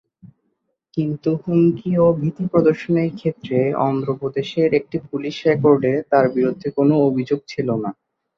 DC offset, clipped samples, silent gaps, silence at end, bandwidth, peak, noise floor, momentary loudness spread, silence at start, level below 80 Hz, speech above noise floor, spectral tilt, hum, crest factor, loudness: under 0.1%; under 0.1%; none; 0.45 s; 7 kHz; -2 dBFS; -71 dBFS; 9 LU; 0.25 s; -58 dBFS; 53 dB; -8.5 dB/octave; none; 18 dB; -19 LUFS